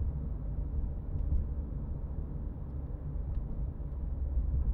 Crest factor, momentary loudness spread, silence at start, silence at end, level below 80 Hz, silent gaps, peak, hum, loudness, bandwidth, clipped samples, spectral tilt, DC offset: 14 dB; 6 LU; 0 s; 0 s; -36 dBFS; none; -20 dBFS; none; -38 LUFS; 2 kHz; under 0.1%; -12.5 dB/octave; under 0.1%